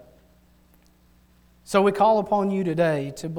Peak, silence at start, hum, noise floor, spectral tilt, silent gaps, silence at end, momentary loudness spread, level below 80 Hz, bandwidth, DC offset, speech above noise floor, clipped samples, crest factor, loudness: -6 dBFS; 1.7 s; none; -58 dBFS; -6.5 dB/octave; none; 0 s; 6 LU; -58 dBFS; 18.5 kHz; under 0.1%; 36 dB; under 0.1%; 18 dB; -22 LUFS